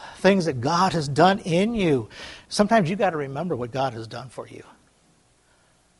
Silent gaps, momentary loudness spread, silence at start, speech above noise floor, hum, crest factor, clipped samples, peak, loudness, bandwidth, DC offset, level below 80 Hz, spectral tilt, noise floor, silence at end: none; 18 LU; 0 s; 38 dB; none; 20 dB; under 0.1%; -4 dBFS; -22 LUFS; 11.5 kHz; under 0.1%; -54 dBFS; -5.5 dB/octave; -61 dBFS; 1.35 s